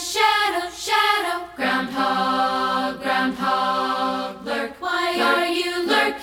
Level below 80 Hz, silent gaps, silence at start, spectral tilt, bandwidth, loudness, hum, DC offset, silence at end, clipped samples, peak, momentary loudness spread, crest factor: -58 dBFS; none; 0 s; -2.5 dB/octave; 19 kHz; -21 LUFS; none; under 0.1%; 0 s; under 0.1%; -6 dBFS; 8 LU; 16 dB